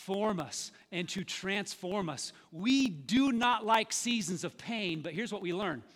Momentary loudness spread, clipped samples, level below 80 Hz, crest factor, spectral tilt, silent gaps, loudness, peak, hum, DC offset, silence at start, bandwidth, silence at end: 10 LU; under 0.1%; -68 dBFS; 20 dB; -3.5 dB/octave; none; -33 LUFS; -14 dBFS; none; under 0.1%; 0 s; 16 kHz; 0.15 s